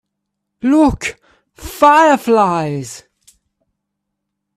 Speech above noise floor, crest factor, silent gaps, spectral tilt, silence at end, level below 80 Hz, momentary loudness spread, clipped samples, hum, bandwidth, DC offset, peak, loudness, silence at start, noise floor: 63 dB; 16 dB; none; -5.5 dB/octave; 1.6 s; -40 dBFS; 22 LU; under 0.1%; none; 15 kHz; under 0.1%; 0 dBFS; -13 LUFS; 0.65 s; -76 dBFS